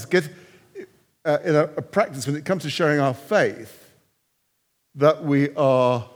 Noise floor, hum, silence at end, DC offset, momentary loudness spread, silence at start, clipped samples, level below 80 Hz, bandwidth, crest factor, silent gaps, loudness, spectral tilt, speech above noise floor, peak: -71 dBFS; none; 0.1 s; under 0.1%; 17 LU; 0 s; under 0.1%; -74 dBFS; over 20 kHz; 20 dB; none; -21 LUFS; -6 dB/octave; 50 dB; -4 dBFS